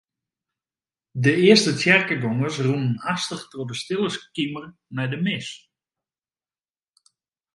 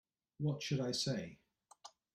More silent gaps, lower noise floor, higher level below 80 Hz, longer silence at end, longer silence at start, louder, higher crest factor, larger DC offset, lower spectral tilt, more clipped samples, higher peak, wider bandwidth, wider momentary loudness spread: neither; first, under -90 dBFS vs -62 dBFS; first, -66 dBFS vs -74 dBFS; first, 2 s vs 0.25 s; first, 1.15 s vs 0.4 s; first, -21 LUFS vs -39 LUFS; first, 24 dB vs 16 dB; neither; about the same, -5 dB/octave vs -5 dB/octave; neither; first, 0 dBFS vs -26 dBFS; second, 11.5 kHz vs 14 kHz; second, 17 LU vs 22 LU